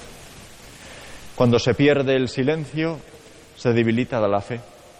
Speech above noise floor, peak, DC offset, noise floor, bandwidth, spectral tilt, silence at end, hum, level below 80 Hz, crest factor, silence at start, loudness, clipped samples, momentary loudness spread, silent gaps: 25 dB; -6 dBFS; under 0.1%; -45 dBFS; 14.5 kHz; -6.5 dB/octave; 0.35 s; none; -50 dBFS; 16 dB; 0 s; -21 LUFS; under 0.1%; 24 LU; none